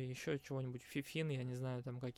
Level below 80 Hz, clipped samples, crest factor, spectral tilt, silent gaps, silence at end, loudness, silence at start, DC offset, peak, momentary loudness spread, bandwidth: -74 dBFS; under 0.1%; 16 dB; -6.5 dB/octave; none; 0.05 s; -44 LUFS; 0 s; under 0.1%; -28 dBFS; 3 LU; 16.5 kHz